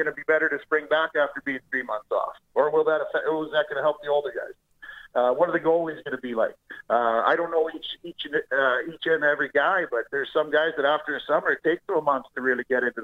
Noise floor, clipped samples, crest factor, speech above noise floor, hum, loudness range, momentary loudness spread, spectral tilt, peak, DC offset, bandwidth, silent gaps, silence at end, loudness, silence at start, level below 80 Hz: -45 dBFS; under 0.1%; 18 dB; 21 dB; none; 2 LU; 8 LU; -6 dB/octave; -6 dBFS; under 0.1%; 6.8 kHz; none; 0 s; -25 LUFS; 0 s; -68 dBFS